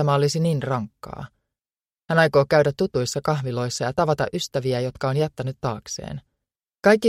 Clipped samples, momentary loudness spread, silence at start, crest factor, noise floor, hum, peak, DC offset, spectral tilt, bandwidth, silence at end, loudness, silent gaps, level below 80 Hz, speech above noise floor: under 0.1%; 17 LU; 0 s; 20 dB; under -90 dBFS; none; -4 dBFS; under 0.1%; -5.5 dB/octave; 15.5 kHz; 0 s; -23 LUFS; none; -54 dBFS; over 68 dB